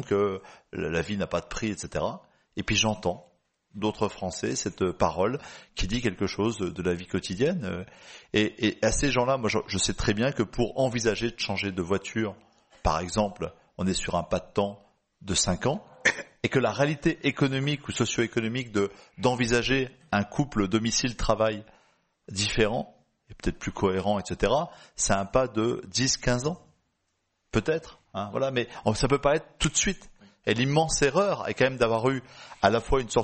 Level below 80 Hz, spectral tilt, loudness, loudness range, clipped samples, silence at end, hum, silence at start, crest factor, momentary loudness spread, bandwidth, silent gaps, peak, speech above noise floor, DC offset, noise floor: -44 dBFS; -4 dB/octave; -27 LUFS; 4 LU; under 0.1%; 0 s; none; 0 s; 24 dB; 10 LU; 8.8 kHz; none; -4 dBFS; 50 dB; under 0.1%; -77 dBFS